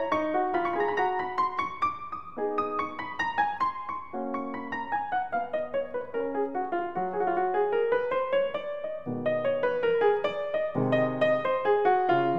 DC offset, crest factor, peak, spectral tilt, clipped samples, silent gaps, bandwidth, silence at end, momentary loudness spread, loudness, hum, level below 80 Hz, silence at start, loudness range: 0.5%; 16 dB; -12 dBFS; -7 dB/octave; under 0.1%; none; 7.2 kHz; 0 s; 9 LU; -28 LUFS; none; -66 dBFS; 0 s; 4 LU